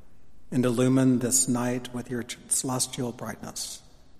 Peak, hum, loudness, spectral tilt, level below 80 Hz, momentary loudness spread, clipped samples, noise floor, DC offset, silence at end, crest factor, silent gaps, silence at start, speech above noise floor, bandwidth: -8 dBFS; none; -26 LUFS; -4.5 dB/octave; -58 dBFS; 13 LU; under 0.1%; -54 dBFS; under 0.1%; 0 s; 18 dB; none; 0 s; 27 dB; 15.5 kHz